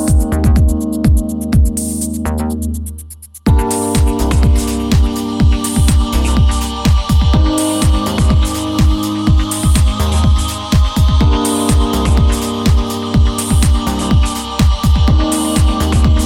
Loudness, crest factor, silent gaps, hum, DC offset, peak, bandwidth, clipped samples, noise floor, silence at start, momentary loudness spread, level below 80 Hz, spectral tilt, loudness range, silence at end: -14 LUFS; 12 dB; none; none; under 0.1%; 0 dBFS; 16.5 kHz; under 0.1%; -32 dBFS; 0 s; 4 LU; -14 dBFS; -5.5 dB/octave; 3 LU; 0 s